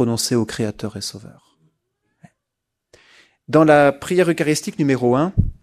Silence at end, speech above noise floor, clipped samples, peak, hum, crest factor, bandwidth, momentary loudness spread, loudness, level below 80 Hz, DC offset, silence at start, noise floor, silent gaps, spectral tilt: 0.1 s; 63 dB; under 0.1%; 0 dBFS; none; 20 dB; 14.5 kHz; 14 LU; -18 LUFS; -38 dBFS; under 0.1%; 0 s; -80 dBFS; none; -5.5 dB/octave